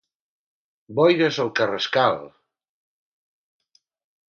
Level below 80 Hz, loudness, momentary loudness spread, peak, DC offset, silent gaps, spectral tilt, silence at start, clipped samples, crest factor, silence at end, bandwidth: -70 dBFS; -21 LUFS; 9 LU; -4 dBFS; under 0.1%; none; -5.5 dB/octave; 0.9 s; under 0.1%; 22 dB; 2.05 s; 7 kHz